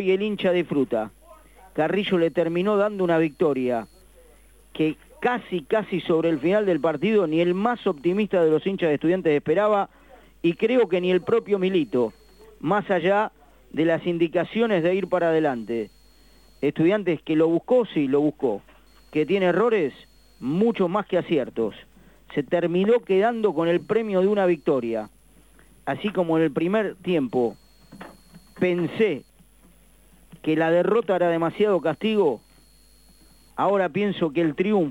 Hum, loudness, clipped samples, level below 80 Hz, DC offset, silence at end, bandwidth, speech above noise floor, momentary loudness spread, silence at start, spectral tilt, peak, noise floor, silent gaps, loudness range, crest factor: none; -23 LUFS; under 0.1%; -58 dBFS; under 0.1%; 0 s; 16 kHz; 33 dB; 8 LU; 0 s; -7.5 dB/octave; -8 dBFS; -55 dBFS; none; 3 LU; 16 dB